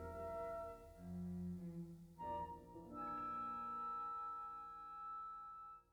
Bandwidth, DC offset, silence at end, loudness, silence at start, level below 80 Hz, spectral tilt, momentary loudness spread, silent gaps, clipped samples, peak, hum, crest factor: over 20 kHz; under 0.1%; 0.1 s; -49 LUFS; 0 s; -68 dBFS; -8 dB/octave; 9 LU; none; under 0.1%; -36 dBFS; none; 12 dB